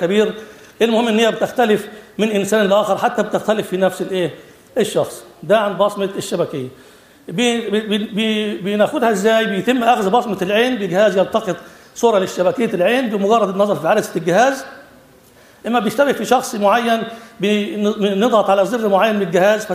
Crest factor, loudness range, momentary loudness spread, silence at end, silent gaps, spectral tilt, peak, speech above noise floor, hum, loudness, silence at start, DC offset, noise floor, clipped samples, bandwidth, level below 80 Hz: 16 dB; 4 LU; 8 LU; 0 s; none; -5 dB/octave; 0 dBFS; 30 dB; none; -17 LUFS; 0 s; under 0.1%; -47 dBFS; under 0.1%; 15.5 kHz; -60 dBFS